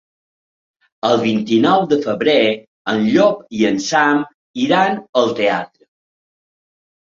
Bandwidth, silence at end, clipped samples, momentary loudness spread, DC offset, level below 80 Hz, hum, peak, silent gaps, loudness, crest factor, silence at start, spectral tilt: 7.6 kHz; 1.5 s; under 0.1%; 9 LU; under 0.1%; -60 dBFS; none; -2 dBFS; 2.67-2.85 s, 4.34-4.54 s, 5.09-5.13 s; -16 LUFS; 16 dB; 1.05 s; -5 dB/octave